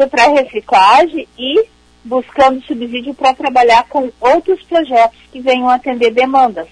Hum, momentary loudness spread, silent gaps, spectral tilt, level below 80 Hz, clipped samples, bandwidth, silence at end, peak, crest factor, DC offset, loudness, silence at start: none; 11 LU; none; -3 dB/octave; -48 dBFS; under 0.1%; 10.5 kHz; 0.05 s; 0 dBFS; 12 dB; under 0.1%; -12 LUFS; 0 s